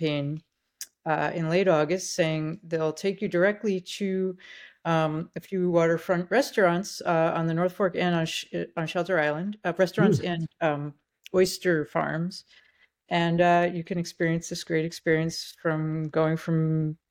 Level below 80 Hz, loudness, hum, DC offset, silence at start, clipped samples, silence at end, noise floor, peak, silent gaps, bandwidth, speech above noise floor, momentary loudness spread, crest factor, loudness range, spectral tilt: -64 dBFS; -26 LUFS; none; under 0.1%; 0 s; under 0.1%; 0.15 s; -46 dBFS; -10 dBFS; none; 17 kHz; 20 dB; 9 LU; 18 dB; 2 LU; -6 dB/octave